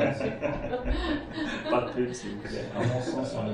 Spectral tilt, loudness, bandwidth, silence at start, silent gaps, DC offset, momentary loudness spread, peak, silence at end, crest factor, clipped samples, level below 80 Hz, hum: -6 dB/octave; -31 LUFS; 11 kHz; 0 s; none; under 0.1%; 6 LU; -12 dBFS; 0 s; 16 dB; under 0.1%; -40 dBFS; none